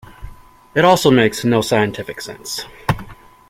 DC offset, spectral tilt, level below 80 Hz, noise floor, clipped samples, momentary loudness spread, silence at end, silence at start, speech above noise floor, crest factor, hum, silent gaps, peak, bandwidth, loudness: under 0.1%; -5 dB/octave; -42 dBFS; -40 dBFS; under 0.1%; 15 LU; 0.35 s; 0.2 s; 24 dB; 16 dB; none; none; 0 dBFS; 16.5 kHz; -16 LUFS